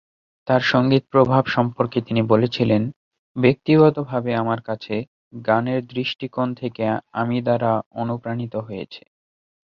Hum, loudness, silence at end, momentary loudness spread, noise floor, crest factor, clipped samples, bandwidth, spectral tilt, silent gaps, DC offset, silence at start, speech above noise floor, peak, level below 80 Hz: none; -21 LUFS; 0.75 s; 12 LU; under -90 dBFS; 20 dB; under 0.1%; 6.8 kHz; -8 dB/octave; 2.96-3.11 s, 3.19-3.35 s, 5.08-5.31 s, 7.86-7.91 s; under 0.1%; 0.45 s; over 70 dB; -2 dBFS; -58 dBFS